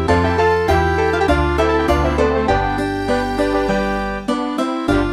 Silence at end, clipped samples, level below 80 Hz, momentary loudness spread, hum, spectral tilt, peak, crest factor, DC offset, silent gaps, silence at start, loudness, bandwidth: 0 s; under 0.1%; -26 dBFS; 5 LU; none; -6.5 dB/octave; 0 dBFS; 16 dB; under 0.1%; none; 0 s; -17 LUFS; 14 kHz